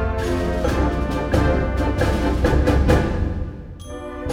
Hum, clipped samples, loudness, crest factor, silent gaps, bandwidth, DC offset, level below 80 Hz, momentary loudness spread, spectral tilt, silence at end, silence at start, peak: none; under 0.1%; -20 LUFS; 16 dB; none; 14 kHz; under 0.1%; -24 dBFS; 15 LU; -7 dB/octave; 0 s; 0 s; -4 dBFS